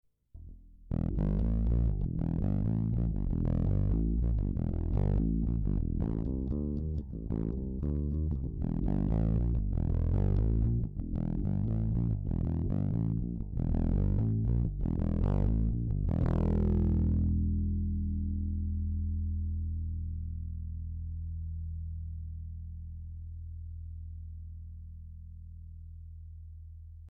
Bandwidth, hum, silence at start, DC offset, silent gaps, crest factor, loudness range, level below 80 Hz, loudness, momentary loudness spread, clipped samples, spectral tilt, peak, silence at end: 2.9 kHz; none; 0.35 s; under 0.1%; none; 10 dB; 12 LU; -34 dBFS; -33 LUFS; 16 LU; under 0.1%; -12.5 dB/octave; -22 dBFS; 0 s